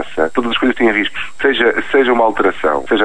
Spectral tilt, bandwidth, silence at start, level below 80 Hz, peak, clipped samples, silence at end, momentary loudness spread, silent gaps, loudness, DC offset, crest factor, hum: -4.5 dB/octave; 10 kHz; 0 s; -42 dBFS; 0 dBFS; under 0.1%; 0 s; 5 LU; none; -14 LUFS; 4%; 14 dB; none